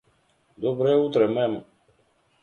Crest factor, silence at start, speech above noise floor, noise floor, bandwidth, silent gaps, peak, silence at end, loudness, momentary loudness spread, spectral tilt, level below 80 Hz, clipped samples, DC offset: 18 dB; 0.6 s; 43 dB; -65 dBFS; 6.8 kHz; none; -8 dBFS; 0.8 s; -23 LUFS; 9 LU; -8 dB/octave; -68 dBFS; under 0.1%; under 0.1%